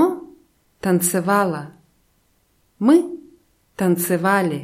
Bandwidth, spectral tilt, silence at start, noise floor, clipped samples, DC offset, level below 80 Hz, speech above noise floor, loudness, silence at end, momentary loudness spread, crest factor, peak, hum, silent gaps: 16 kHz; -5.5 dB/octave; 0 s; -63 dBFS; under 0.1%; under 0.1%; -62 dBFS; 45 dB; -19 LUFS; 0 s; 18 LU; 18 dB; -2 dBFS; none; none